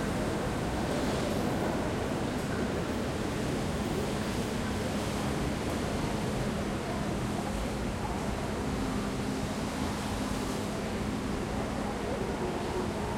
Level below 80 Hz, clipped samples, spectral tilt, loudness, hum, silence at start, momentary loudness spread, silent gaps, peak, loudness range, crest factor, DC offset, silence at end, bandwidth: -42 dBFS; under 0.1%; -5.5 dB/octave; -33 LUFS; none; 0 s; 3 LU; none; -18 dBFS; 1 LU; 14 dB; under 0.1%; 0 s; 16.5 kHz